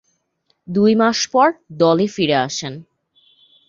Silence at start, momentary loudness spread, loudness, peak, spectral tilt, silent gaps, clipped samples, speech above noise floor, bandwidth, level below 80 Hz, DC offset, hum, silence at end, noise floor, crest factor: 0.7 s; 11 LU; -17 LUFS; -2 dBFS; -4.5 dB/octave; none; under 0.1%; 50 dB; 7.6 kHz; -60 dBFS; under 0.1%; none; 0.85 s; -67 dBFS; 16 dB